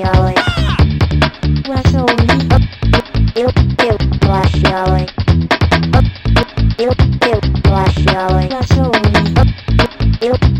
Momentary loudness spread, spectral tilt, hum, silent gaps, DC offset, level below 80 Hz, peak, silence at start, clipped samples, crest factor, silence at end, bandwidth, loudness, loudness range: 3 LU; -7 dB/octave; none; none; under 0.1%; -18 dBFS; 0 dBFS; 0 s; under 0.1%; 12 dB; 0 s; 10.5 kHz; -13 LUFS; 1 LU